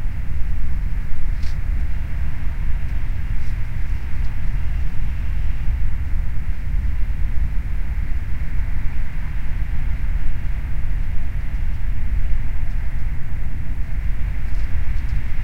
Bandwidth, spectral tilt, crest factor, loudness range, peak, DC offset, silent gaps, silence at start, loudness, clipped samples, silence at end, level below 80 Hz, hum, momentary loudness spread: 3.1 kHz; -7.5 dB/octave; 12 dB; 1 LU; -4 dBFS; 7%; none; 0 s; -27 LUFS; under 0.1%; 0 s; -20 dBFS; none; 3 LU